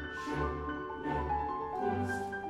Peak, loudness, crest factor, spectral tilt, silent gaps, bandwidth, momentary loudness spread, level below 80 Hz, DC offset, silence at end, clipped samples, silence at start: -22 dBFS; -36 LUFS; 14 dB; -6.5 dB/octave; none; 13.5 kHz; 4 LU; -48 dBFS; under 0.1%; 0 s; under 0.1%; 0 s